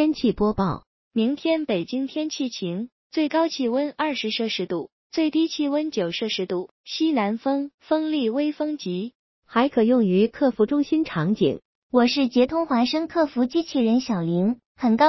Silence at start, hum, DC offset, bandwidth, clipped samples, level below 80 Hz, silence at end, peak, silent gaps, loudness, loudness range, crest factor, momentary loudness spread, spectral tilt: 0 s; none; under 0.1%; 6.2 kHz; under 0.1%; -54 dBFS; 0 s; -6 dBFS; 0.87-1.11 s, 2.92-3.10 s, 4.92-5.10 s, 6.71-6.84 s, 7.74-7.78 s, 9.15-9.42 s, 11.65-11.90 s, 14.66-14.75 s; -23 LUFS; 4 LU; 18 dB; 9 LU; -6 dB/octave